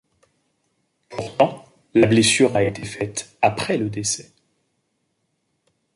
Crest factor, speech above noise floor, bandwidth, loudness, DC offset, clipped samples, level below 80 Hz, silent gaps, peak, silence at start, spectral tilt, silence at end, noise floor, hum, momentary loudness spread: 20 dB; 53 dB; 11.5 kHz; -20 LUFS; under 0.1%; under 0.1%; -54 dBFS; none; -2 dBFS; 1.1 s; -4 dB/octave; 1.75 s; -72 dBFS; none; 15 LU